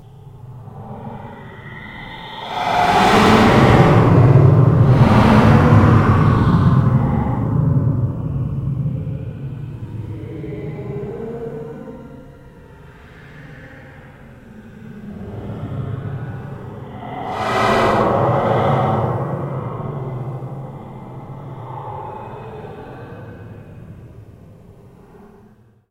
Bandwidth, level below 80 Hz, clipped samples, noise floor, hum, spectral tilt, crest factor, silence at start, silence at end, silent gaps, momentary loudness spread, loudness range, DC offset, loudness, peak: 13 kHz; -34 dBFS; under 0.1%; -49 dBFS; none; -7.5 dB/octave; 18 dB; 0.25 s; 1.6 s; none; 24 LU; 22 LU; under 0.1%; -15 LUFS; 0 dBFS